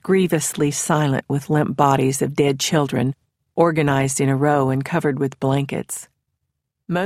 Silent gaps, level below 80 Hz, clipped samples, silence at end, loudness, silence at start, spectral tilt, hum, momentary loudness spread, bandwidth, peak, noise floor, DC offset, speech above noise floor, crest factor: none; -54 dBFS; under 0.1%; 0 s; -19 LUFS; 0.05 s; -5.5 dB/octave; none; 8 LU; 15.5 kHz; -2 dBFS; -77 dBFS; under 0.1%; 58 dB; 18 dB